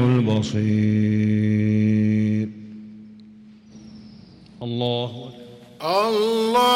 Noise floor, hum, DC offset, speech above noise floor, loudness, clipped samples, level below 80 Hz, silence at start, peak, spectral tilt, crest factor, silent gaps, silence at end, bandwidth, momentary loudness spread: -46 dBFS; none; under 0.1%; 26 dB; -21 LUFS; under 0.1%; -60 dBFS; 0 s; -8 dBFS; -7 dB/octave; 12 dB; none; 0 s; 16 kHz; 20 LU